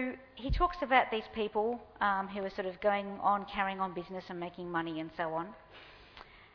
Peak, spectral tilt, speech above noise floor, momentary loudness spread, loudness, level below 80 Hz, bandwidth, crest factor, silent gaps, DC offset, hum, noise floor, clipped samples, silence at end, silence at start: -10 dBFS; -7.5 dB/octave; 21 dB; 23 LU; -34 LUFS; -48 dBFS; 5.4 kHz; 24 dB; none; under 0.1%; none; -55 dBFS; under 0.1%; 0.1 s; 0 s